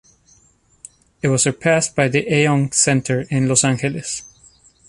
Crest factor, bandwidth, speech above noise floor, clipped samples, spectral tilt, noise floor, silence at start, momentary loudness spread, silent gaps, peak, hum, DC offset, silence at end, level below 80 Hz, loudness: 18 dB; 11.5 kHz; 39 dB; under 0.1%; -4 dB/octave; -56 dBFS; 1.25 s; 9 LU; none; -2 dBFS; none; under 0.1%; 0.65 s; -52 dBFS; -17 LUFS